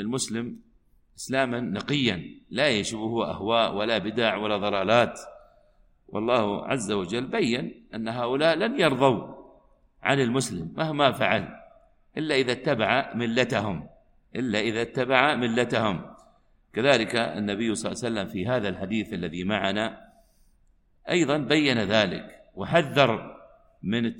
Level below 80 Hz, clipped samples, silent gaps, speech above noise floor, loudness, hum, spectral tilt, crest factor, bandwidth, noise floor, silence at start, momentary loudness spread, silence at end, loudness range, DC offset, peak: -58 dBFS; under 0.1%; none; 37 dB; -25 LUFS; none; -4.5 dB/octave; 24 dB; 16 kHz; -62 dBFS; 0 s; 12 LU; 0 s; 3 LU; under 0.1%; -2 dBFS